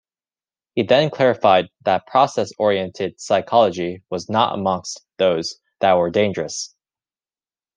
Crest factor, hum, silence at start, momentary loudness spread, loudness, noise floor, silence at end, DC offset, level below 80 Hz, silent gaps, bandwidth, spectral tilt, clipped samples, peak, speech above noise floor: 18 dB; none; 0.75 s; 11 LU; -19 LUFS; under -90 dBFS; 1.1 s; under 0.1%; -64 dBFS; none; 10 kHz; -4.5 dB/octave; under 0.1%; -2 dBFS; over 71 dB